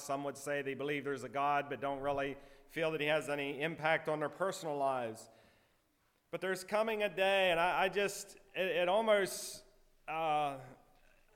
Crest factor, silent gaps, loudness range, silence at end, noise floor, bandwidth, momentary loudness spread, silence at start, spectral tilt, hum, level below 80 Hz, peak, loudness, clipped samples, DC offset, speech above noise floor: 18 dB; none; 5 LU; 0.6 s; -76 dBFS; 16.5 kHz; 14 LU; 0 s; -3.5 dB/octave; none; -68 dBFS; -18 dBFS; -35 LUFS; under 0.1%; under 0.1%; 40 dB